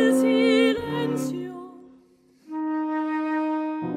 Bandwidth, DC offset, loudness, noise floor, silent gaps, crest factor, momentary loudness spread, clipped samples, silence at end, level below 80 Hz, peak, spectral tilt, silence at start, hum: 15 kHz; under 0.1%; -24 LUFS; -57 dBFS; none; 16 dB; 17 LU; under 0.1%; 0 s; -62 dBFS; -8 dBFS; -5.5 dB/octave; 0 s; none